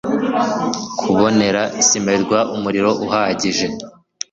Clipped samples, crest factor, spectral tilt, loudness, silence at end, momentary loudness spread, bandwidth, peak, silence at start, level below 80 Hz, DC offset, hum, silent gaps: under 0.1%; 16 dB; -3.5 dB/octave; -17 LUFS; 0.4 s; 8 LU; 8 kHz; -2 dBFS; 0.05 s; -52 dBFS; under 0.1%; none; none